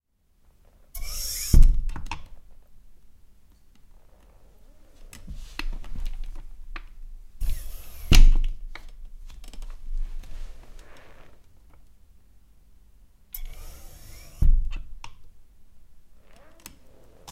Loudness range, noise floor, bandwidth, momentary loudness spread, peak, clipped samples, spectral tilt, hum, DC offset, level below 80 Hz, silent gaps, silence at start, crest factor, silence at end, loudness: 19 LU; -61 dBFS; 15 kHz; 27 LU; -2 dBFS; under 0.1%; -4 dB/octave; none; under 0.1%; -26 dBFS; none; 0.95 s; 22 dB; 1.3 s; -28 LUFS